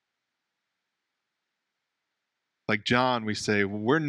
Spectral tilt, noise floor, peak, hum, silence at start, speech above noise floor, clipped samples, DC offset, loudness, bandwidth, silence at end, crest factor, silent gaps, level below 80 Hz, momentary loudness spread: -5 dB/octave; -84 dBFS; -8 dBFS; none; 2.7 s; 58 dB; under 0.1%; under 0.1%; -26 LUFS; 12 kHz; 0 s; 24 dB; none; -66 dBFS; 6 LU